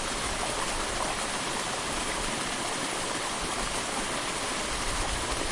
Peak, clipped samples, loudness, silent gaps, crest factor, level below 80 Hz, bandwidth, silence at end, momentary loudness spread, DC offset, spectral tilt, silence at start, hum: -16 dBFS; under 0.1%; -30 LUFS; none; 14 dB; -42 dBFS; 11.5 kHz; 0 s; 1 LU; under 0.1%; -2 dB/octave; 0 s; none